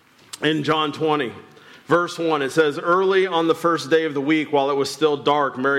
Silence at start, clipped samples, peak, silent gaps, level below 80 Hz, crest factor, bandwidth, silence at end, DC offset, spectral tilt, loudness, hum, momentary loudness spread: 0.35 s; under 0.1%; -6 dBFS; none; -68 dBFS; 14 dB; 14.5 kHz; 0 s; under 0.1%; -5 dB/octave; -20 LUFS; none; 4 LU